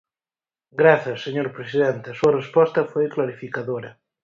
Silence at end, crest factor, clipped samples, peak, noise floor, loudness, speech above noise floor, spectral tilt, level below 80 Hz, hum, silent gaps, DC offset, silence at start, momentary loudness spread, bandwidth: 0.3 s; 20 dB; under 0.1%; -2 dBFS; under -90 dBFS; -21 LUFS; over 69 dB; -7 dB/octave; -64 dBFS; none; none; under 0.1%; 0.75 s; 13 LU; 7.4 kHz